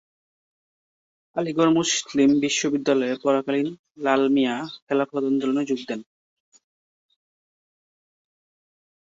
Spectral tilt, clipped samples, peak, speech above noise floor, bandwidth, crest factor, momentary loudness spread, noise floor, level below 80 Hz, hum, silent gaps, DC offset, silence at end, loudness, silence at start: -4 dB/octave; under 0.1%; -6 dBFS; over 68 dB; 8 kHz; 18 dB; 10 LU; under -90 dBFS; -68 dBFS; none; 3.79-3.84 s, 4.82-4.87 s; under 0.1%; 3.05 s; -23 LUFS; 1.35 s